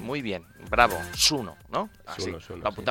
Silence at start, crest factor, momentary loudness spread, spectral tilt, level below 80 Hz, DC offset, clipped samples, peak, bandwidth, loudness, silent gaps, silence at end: 0 s; 26 dB; 12 LU; -2.5 dB/octave; -46 dBFS; under 0.1%; under 0.1%; -2 dBFS; 17 kHz; -26 LUFS; none; 0 s